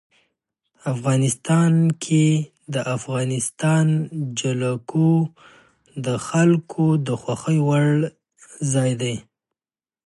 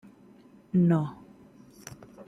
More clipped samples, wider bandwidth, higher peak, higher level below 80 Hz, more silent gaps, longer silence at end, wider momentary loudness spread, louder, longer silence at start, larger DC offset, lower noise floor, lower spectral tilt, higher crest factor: neither; first, 11.5 kHz vs 10 kHz; first, -6 dBFS vs -14 dBFS; about the same, -62 dBFS vs -66 dBFS; neither; first, 0.85 s vs 0.05 s; second, 10 LU vs 24 LU; first, -21 LUFS vs -26 LUFS; about the same, 0.85 s vs 0.75 s; neither; first, under -90 dBFS vs -55 dBFS; second, -6 dB/octave vs -8.5 dB/octave; about the same, 16 dB vs 16 dB